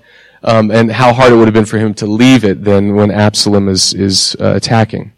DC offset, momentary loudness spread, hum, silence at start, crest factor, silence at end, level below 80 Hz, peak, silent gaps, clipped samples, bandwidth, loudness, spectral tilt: under 0.1%; 6 LU; none; 0.45 s; 10 dB; 0.1 s; -42 dBFS; 0 dBFS; none; under 0.1%; 15 kHz; -9 LUFS; -5 dB/octave